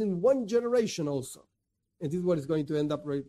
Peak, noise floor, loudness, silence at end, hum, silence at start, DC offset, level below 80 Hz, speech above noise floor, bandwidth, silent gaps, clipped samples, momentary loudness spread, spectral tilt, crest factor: -14 dBFS; -74 dBFS; -29 LUFS; 0.05 s; none; 0 s; under 0.1%; -64 dBFS; 45 dB; 14 kHz; none; under 0.1%; 11 LU; -6.5 dB/octave; 16 dB